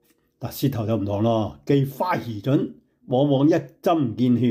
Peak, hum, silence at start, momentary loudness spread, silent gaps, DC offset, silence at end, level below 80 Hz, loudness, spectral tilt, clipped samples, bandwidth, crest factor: -8 dBFS; none; 0.4 s; 7 LU; none; under 0.1%; 0 s; -58 dBFS; -23 LUFS; -8 dB/octave; under 0.1%; 16 kHz; 14 dB